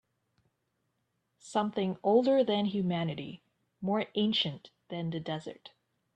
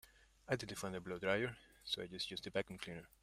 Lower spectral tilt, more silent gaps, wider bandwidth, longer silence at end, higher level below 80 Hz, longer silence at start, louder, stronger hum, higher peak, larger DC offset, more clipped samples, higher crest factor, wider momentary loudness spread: first, -6.5 dB/octave vs -4 dB/octave; neither; second, 9.4 kHz vs 16 kHz; first, 0.45 s vs 0.15 s; about the same, -74 dBFS vs -70 dBFS; first, 1.45 s vs 0.05 s; first, -31 LUFS vs -43 LUFS; neither; first, -14 dBFS vs -22 dBFS; neither; neither; about the same, 20 dB vs 22 dB; first, 15 LU vs 11 LU